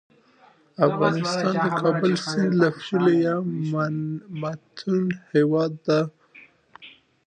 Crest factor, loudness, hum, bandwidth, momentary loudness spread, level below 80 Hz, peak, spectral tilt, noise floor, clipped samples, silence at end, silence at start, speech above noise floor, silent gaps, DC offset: 18 dB; -23 LUFS; none; 9.6 kHz; 11 LU; -70 dBFS; -4 dBFS; -6.5 dB/octave; -56 dBFS; under 0.1%; 0.4 s; 0.8 s; 34 dB; none; under 0.1%